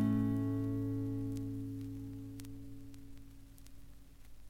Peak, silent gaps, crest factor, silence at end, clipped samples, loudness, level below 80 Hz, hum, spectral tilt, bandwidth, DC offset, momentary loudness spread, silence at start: -22 dBFS; none; 16 dB; 0 s; under 0.1%; -39 LUFS; -56 dBFS; 50 Hz at -60 dBFS; -8.5 dB/octave; 16 kHz; under 0.1%; 24 LU; 0 s